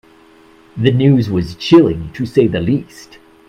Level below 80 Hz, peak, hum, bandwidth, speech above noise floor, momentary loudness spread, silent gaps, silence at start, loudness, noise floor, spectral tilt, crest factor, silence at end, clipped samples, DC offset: -42 dBFS; 0 dBFS; none; 10 kHz; 32 dB; 10 LU; none; 0.75 s; -14 LUFS; -45 dBFS; -8 dB/octave; 14 dB; 0.45 s; under 0.1%; under 0.1%